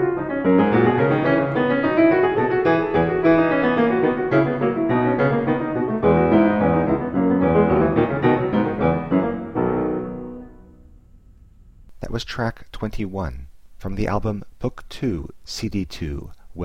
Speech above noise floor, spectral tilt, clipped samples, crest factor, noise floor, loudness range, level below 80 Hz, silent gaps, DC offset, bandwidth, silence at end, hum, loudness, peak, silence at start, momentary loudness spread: 26 dB; -8 dB/octave; under 0.1%; 16 dB; -48 dBFS; 12 LU; -40 dBFS; none; under 0.1%; 8.8 kHz; 0 s; none; -20 LUFS; -4 dBFS; 0 s; 14 LU